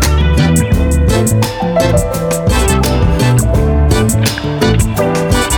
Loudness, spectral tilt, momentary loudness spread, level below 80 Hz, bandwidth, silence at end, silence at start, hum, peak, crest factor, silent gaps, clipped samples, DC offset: -12 LUFS; -5.5 dB/octave; 3 LU; -16 dBFS; 20 kHz; 0 s; 0 s; none; 0 dBFS; 10 dB; none; under 0.1%; under 0.1%